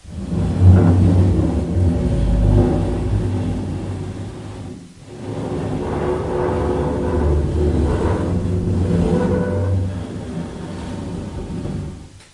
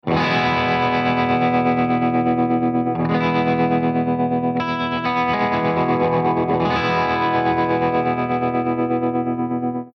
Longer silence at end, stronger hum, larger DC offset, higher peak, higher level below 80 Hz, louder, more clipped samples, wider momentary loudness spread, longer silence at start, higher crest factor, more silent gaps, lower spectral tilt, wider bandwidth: about the same, 0.1 s vs 0.05 s; neither; neither; first, 0 dBFS vs -8 dBFS; first, -26 dBFS vs -52 dBFS; about the same, -19 LUFS vs -19 LUFS; neither; first, 15 LU vs 3 LU; about the same, 0.05 s vs 0.05 s; first, 18 dB vs 12 dB; neither; about the same, -8.5 dB/octave vs -8 dB/octave; first, 11 kHz vs 6.4 kHz